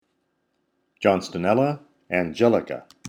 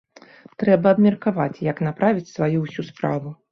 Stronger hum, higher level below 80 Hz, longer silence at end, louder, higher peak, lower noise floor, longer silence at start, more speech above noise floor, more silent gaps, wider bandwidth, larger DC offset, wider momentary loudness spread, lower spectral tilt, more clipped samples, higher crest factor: neither; about the same, -62 dBFS vs -60 dBFS; second, 0 s vs 0.2 s; about the same, -23 LUFS vs -21 LUFS; about the same, -4 dBFS vs -4 dBFS; first, -72 dBFS vs -48 dBFS; first, 1 s vs 0.6 s; first, 51 dB vs 27 dB; neither; first, 16.5 kHz vs 6.4 kHz; neither; about the same, 7 LU vs 9 LU; second, -6.5 dB/octave vs -8.5 dB/octave; neither; about the same, 20 dB vs 18 dB